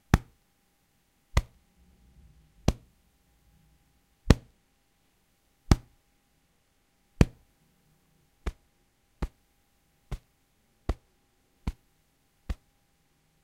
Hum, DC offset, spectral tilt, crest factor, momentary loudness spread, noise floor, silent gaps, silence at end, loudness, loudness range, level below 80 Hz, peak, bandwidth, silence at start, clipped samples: none; under 0.1%; -6.5 dB/octave; 34 dB; 19 LU; -70 dBFS; none; 0.9 s; -32 LUFS; 12 LU; -38 dBFS; 0 dBFS; 16 kHz; 0.15 s; under 0.1%